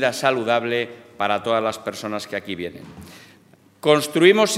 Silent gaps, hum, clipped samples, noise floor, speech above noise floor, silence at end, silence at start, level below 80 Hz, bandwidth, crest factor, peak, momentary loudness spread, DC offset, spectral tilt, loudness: none; none; under 0.1%; -53 dBFS; 33 dB; 0 s; 0 s; -66 dBFS; 16 kHz; 20 dB; 0 dBFS; 17 LU; under 0.1%; -4 dB/octave; -21 LUFS